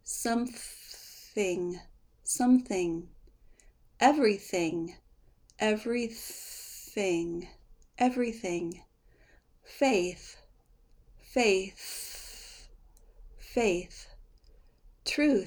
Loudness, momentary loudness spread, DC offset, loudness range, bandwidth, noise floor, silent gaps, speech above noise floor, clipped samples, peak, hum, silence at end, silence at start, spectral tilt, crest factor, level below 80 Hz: -30 LUFS; 19 LU; under 0.1%; 5 LU; over 20 kHz; -62 dBFS; none; 33 dB; under 0.1%; -10 dBFS; none; 0 s; 0.05 s; -3.5 dB/octave; 24 dB; -58 dBFS